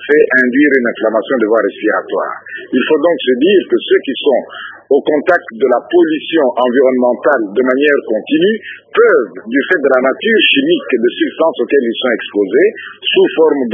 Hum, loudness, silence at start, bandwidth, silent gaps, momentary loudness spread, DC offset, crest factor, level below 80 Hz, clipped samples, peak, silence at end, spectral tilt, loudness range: none; -12 LUFS; 0 s; 3.8 kHz; none; 6 LU; under 0.1%; 12 dB; -64 dBFS; under 0.1%; 0 dBFS; 0 s; -7 dB/octave; 2 LU